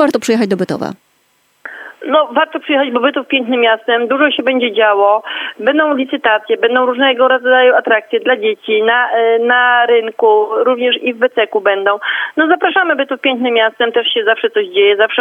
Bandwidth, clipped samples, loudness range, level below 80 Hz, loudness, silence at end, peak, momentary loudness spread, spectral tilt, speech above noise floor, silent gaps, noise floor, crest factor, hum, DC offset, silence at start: 12.5 kHz; under 0.1%; 3 LU; -70 dBFS; -12 LUFS; 0 s; 0 dBFS; 6 LU; -4 dB/octave; 45 dB; none; -57 dBFS; 12 dB; none; under 0.1%; 0 s